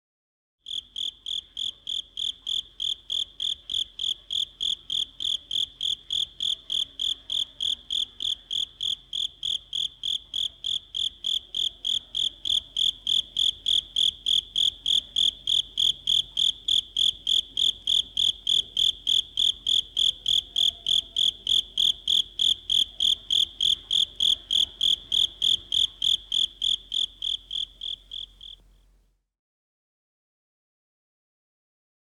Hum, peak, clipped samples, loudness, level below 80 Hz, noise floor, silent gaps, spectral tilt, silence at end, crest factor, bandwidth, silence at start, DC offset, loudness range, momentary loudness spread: none; -14 dBFS; under 0.1%; -24 LUFS; -56 dBFS; -64 dBFS; none; 1 dB/octave; 3.5 s; 14 dB; 15 kHz; 0.7 s; under 0.1%; 7 LU; 8 LU